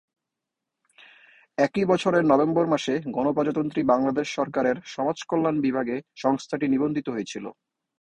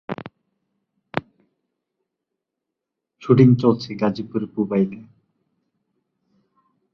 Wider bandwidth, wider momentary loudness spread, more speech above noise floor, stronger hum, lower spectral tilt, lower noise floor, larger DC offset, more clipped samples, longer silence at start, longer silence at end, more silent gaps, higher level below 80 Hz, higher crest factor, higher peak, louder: first, 9.8 kHz vs 6.8 kHz; second, 10 LU vs 19 LU; second, 61 dB vs 65 dB; neither; second, -6 dB/octave vs -9 dB/octave; about the same, -85 dBFS vs -83 dBFS; neither; neither; first, 1.6 s vs 0.1 s; second, 0.5 s vs 1.9 s; neither; second, -64 dBFS vs -58 dBFS; about the same, 20 dB vs 24 dB; second, -4 dBFS vs 0 dBFS; second, -24 LUFS vs -20 LUFS